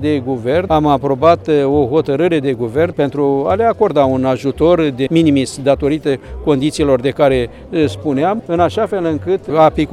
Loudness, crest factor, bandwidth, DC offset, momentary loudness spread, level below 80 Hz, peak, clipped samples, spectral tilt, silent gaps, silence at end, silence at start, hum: -14 LUFS; 14 dB; 12.5 kHz; under 0.1%; 5 LU; -38 dBFS; 0 dBFS; under 0.1%; -7 dB/octave; none; 0 s; 0 s; none